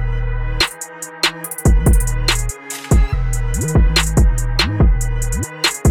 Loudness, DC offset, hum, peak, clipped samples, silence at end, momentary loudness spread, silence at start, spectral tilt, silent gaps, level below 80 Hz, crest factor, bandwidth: -17 LUFS; 1%; none; -2 dBFS; under 0.1%; 0 s; 8 LU; 0 s; -4 dB/octave; none; -18 dBFS; 14 dB; 17.5 kHz